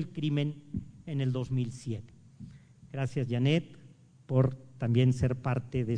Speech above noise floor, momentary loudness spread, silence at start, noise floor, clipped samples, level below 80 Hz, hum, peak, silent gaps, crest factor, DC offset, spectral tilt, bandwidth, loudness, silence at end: 26 dB; 16 LU; 0 s; -56 dBFS; under 0.1%; -56 dBFS; none; -14 dBFS; none; 18 dB; under 0.1%; -8 dB/octave; 9.6 kHz; -31 LUFS; 0 s